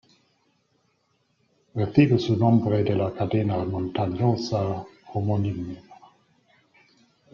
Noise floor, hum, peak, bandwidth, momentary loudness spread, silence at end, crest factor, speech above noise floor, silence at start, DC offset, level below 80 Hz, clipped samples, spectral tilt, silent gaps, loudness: -70 dBFS; none; -6 dBFS; 7 kHz; 14 LU; 1.4 s; 20 dB; 47 dB; 1.75 s; under 0.1%; -58 dBFS; under 0.1%; -8.5 dB/octave; none; -24 LUFS